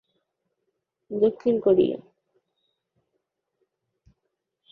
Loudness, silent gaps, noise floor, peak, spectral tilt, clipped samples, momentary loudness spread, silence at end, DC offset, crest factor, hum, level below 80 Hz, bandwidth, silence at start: -22 LUFS; none; -80 dBFS; -8 dBFS; -9.5 dB/octave; under 0.1%; 14 LU; 2.75 s; under 0.1%; 20 dB; none; -66 dBFS; 4.8 kHz; 1.1 s